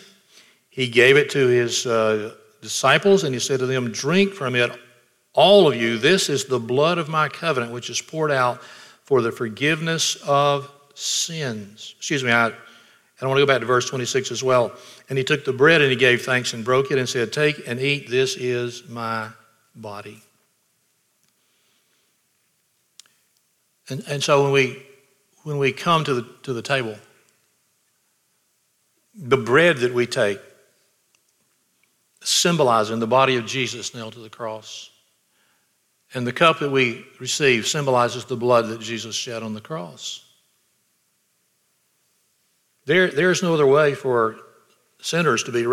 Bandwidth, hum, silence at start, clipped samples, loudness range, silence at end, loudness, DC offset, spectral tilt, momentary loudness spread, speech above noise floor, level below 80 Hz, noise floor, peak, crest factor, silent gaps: 15.5 kHz; none; 0.75 s; under 0.1%; 8 LU; 0 s; -20 LUFS; under 0.1%; -4 dB/octave; 16 LU; 47 dB; -70 dBFS; -68 dBFS; -2 dBFS; 20 dB; none